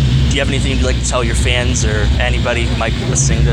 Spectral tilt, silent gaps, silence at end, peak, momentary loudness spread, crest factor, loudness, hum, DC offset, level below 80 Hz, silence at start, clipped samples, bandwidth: -4.5 dB/octave; none; 0 s; 0 dBFS; 2 LU; 12 dB; -15 LUFS; none; under 0.1%; -18 dBFS; 0 s; under 0.1%; 11.5 kHz